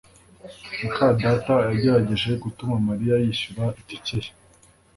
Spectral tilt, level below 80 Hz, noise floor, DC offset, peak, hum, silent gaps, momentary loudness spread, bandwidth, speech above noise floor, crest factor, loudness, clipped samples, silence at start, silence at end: -7 dB/octave; -48 dBFS; -55 dBFS; under 0.1%; -6 dBFS; none; none; 12 LU; 11.5 kHz; 33 dB; 18 dB; -23 LUFS; under 0.1%; 0.45 s; 0.65 s